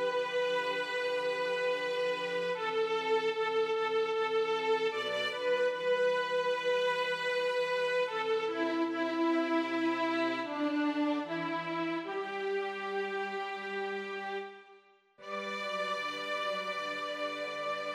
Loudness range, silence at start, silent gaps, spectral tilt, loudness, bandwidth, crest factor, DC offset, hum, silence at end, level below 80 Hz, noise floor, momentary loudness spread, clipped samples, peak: 6 LU; 0 s; none; -4 dB/octave; -33 LUFS; 12.5 kHz; 14 dB; under 0.1%; none; 0 s; -90 dBFS; -61 dBFS; 6 LU; under 0.1%; -20 dBFS